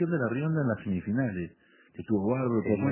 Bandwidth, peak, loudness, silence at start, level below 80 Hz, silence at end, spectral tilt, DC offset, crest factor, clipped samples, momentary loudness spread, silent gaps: 3.2 kHz; -14 dBFS; -29 LUFS; 0 s; -56 dBFS; 0 s; -9 dB/octave; under 0.1%; 16 dB; under 0.1%; 13 LU; none